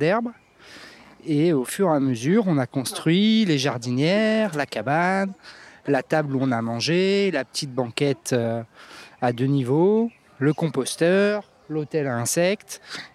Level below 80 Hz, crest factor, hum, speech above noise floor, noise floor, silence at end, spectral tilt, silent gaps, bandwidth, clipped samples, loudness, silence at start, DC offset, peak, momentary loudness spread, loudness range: -70 dBFS; 18 dB; none; 23 dB; -45 dBFS; 0.05 s; -5.5 dB/octave; none; 15 kHz; under 0.1%; -22 LUFS; 0 s; under 0.1%; -4 dBFS; 12 LU; 3 LU